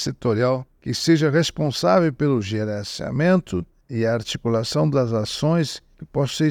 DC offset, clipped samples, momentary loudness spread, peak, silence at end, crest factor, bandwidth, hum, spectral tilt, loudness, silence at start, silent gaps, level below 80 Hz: under 0.1%; under 0.1%; 10 LU; -4 dBFS; 0 s; 18 dB; 16 kHz; none; -6 dB/octave; -22 LUFS; 0 s; none; -52 dBFS